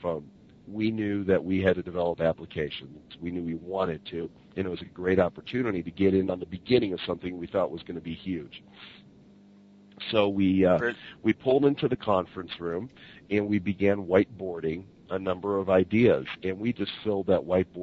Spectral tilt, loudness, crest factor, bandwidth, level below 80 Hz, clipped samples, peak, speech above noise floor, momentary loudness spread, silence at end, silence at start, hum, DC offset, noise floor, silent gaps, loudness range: -8.5 dB/octave; -28 LUFS; 20 dB; 6.8 kHz; -60 dBFS; under 0.1%; -6 dBFS; 27 dB; 14 LU; 0 s; 0 s; none; under 0.1%; -54 dBFS; none; 5 LU